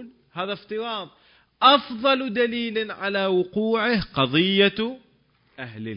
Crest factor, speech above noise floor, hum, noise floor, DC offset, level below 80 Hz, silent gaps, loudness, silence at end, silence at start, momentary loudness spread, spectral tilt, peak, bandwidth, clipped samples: 20 dB; 40 dB; none; -62 dBFS; under 0.1%; -56 dBFS; none; -22 LUFS; 0 s; 0 s; 16 LU; -9.5 dB/octave; -4 dBFS; 5.4 kHz; under 0.1%